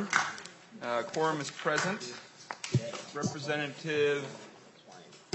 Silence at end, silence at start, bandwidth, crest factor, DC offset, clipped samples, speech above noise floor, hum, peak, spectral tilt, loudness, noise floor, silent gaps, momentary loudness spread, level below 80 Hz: 0.1 s; 0 s; 8.2 kHz; 26 dB; under 0.1%; under 0.1%; 21 dB; none; -8 dBFS; -4 dB/octave; -33 LUFS; -54 dBFS; none; 19 LU; -76 dBFS